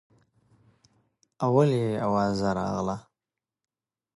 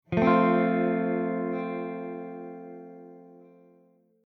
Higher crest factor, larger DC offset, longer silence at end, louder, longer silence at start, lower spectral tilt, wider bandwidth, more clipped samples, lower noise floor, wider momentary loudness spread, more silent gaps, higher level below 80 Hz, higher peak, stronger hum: about the same, 20 dB vs 20 dB; neither; first, 1.15 s vs 0.9 s; about the same, -26 LUFS vs -26 LUFS; first, 1.4 s vs 0.1 s; second, -7.5 dB/octave vs -9.5 dB/octave; first, 11.5 kHz vs 6 kHz; neither; first, -90 dBFS vs -63 dBFS; second, 9 LU vs 22 LU; neither; about the same, -56 dBFS vs -60 dBFS; about the same, -10 dBFS vs -8 dBFS; neither